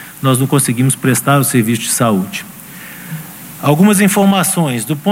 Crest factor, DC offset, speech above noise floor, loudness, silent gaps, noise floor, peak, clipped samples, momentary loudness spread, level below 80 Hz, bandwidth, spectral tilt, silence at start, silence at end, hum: 14 dB; under 0.1%; 20 dB; -12 LUFS; none; -32 dBFS; 0 dBFS; under 0.1%; 18 LU; -54 dBFS; 16.5 kHz; -5 dB/octave; 0 s; 0 s; none